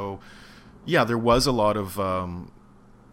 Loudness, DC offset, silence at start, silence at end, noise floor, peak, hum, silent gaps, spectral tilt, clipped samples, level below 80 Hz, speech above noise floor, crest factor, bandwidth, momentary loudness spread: -23 LUFS; under 0.1%; 0 s; 0.65 s; -51 dBFS; -6 dBFS; none; none; -5 dB/octave; under 0.1%; -42 dBFS; 29 dB; 18 dB; 16 kHz; 19 LU